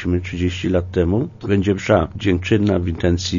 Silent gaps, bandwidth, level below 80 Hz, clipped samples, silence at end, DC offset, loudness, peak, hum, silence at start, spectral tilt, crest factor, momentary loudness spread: none; 7.4 kHz; -36 dBFS; under 0.1%; 0 s; under 0.1%; -19 LUFS; -2 dBFS; none; 0 s; -6.5 dB/octave; 16 dB; 5 LU